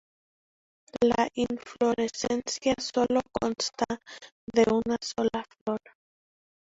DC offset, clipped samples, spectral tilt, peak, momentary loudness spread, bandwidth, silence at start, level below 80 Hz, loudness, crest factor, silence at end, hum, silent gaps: under 0.1%; under 0.1%; -4 dB/octave; -10 dBFS; 10 LU; 8 kHz; 0.95 s; -58 dBFS; -28 LUFS; 20 dB; 1 s; none; 4.32-4.47 s, 5.61-5.66 s